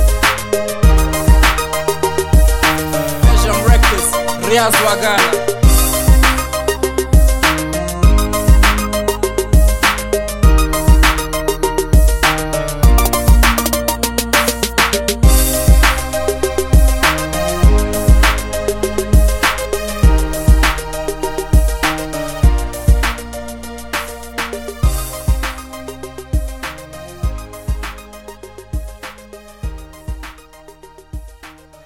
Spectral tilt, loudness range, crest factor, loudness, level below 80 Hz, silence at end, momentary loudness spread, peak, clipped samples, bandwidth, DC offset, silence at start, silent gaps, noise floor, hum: -4 dB/octave; 13 LU; 14 dB; -14 LUFS; -16 dBFS; 0.35 s; 17 LU; 0 dBFS; under 0.1%; 17 kHz; under 0.1%; 0 s; none; -40 dBFS; none